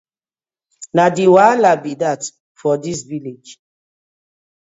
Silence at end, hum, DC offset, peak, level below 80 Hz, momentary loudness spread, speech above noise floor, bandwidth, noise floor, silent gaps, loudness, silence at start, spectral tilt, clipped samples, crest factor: 1.15 s; none; under 0.1%; 0 dBFS; -62 dBFS; 18 LU; over 75 dB; 8 kHz; under -90 dBFS; 2.40-2.55 s; -15 LUFS; 0.8 s; -5.5 dB/octave; under 0.1%; 18 dB